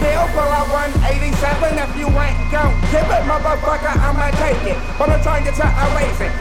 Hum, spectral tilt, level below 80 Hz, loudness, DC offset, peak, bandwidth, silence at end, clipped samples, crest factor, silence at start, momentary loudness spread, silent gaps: none; -6 dB/octave; -18 dBFS; -17 LUFS; under 0.1%; 0 dBFS; 14.5 kHz; 0 s; under 0.1%; 14 dB; 0 s; 3 LU; none